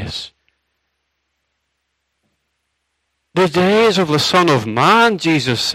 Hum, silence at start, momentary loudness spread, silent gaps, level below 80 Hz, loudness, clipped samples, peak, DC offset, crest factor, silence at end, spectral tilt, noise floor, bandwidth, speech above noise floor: none; 0 s; 13 LU; none; -54 dBFS; -14 LUFS; under 0.1%; 0 dBFS; under 0.1%; 18 dB; 0 s; -4.5 dB/octave; -72 dBFS; 16 kHz; 58 dB